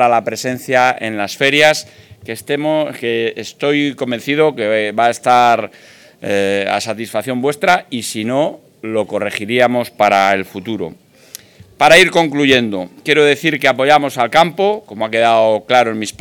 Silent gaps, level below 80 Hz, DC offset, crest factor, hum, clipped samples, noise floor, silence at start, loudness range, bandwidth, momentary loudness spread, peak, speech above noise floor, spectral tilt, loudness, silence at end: none; -56 dBFS; under 0.1%; 14 dB; none; under 0.1%; -39 dBFS; 0 s; 5 LU; 19 kHz; 11 LU; 0 dBFS; 25 dB; -4 dB/octave; -14 LUFS; 0.1 s